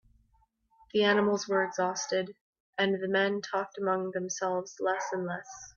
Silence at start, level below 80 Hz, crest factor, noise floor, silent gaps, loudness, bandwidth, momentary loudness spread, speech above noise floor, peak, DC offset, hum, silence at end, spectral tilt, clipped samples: 0.95 s; -72 dBFS; 18 dB; -70 dBFS; 2.41-2.53 s, 2.60-2.73 s; -30 LUFS; 7.4 kHz; 8 LU; 40 dB; -12 dBFS; under 0.1%; none; 0.05 s; -4 dB/octave; under 0.1%